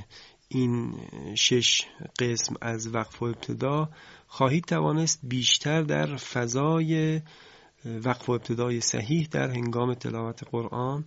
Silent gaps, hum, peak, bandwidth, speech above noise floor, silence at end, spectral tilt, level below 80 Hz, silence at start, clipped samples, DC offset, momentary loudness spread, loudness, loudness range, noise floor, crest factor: none; none; -8 dBFS; 8 kHz; 23 dB; 0 s; -4 dB/octave; -60 dBFS; 0 s; under 0.1%; under 0.1%; 11 LU; -27 LUFS; 3 LU; -51 dBFS; 20 dB